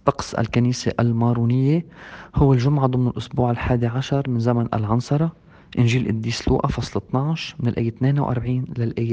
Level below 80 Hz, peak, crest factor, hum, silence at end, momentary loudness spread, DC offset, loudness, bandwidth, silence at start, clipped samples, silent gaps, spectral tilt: -40 dBFS; 0 dBFS; 20 dB; none; 0 s; 6 LU; under 0.1%; -21 LUFS; 8.4 kHz; 0.05 s; under 0.1%; none; -7.5 dB/octave